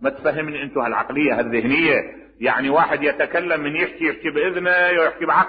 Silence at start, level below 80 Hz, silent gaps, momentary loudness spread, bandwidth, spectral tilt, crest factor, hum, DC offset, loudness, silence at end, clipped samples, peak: 0 s; -56 dBFS; none; 6 LU; 5 kHz; -9.5 dB/octave; 16 dB; none; under 0.1%; -19 LUFS; 0 s; under 0.1%; -4 dBFS